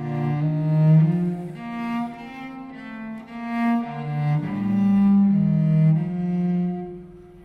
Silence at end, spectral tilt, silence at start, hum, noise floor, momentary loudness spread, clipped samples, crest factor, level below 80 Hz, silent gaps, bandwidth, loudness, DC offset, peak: 0 s; -10.5 dB/octave; 0 s; none; -41 dBFS; 18 LU; under 0.1%; 14 dB; -54 dBFS; none; 4.7 kHz; -22 LUFS; under 0.1%; -8 dBFS